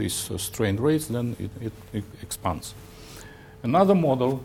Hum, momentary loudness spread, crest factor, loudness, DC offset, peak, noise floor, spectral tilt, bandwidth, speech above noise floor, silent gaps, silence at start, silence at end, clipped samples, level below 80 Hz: none; 23 LU; 20 dB; -25 LUFS; under 0.1%; -6 dBFS; -44 dBFS; -5.5 dB/octave; 18 kHz; 19 dB; none; 0 s; 0 s; under 0.1%; -52 dBFS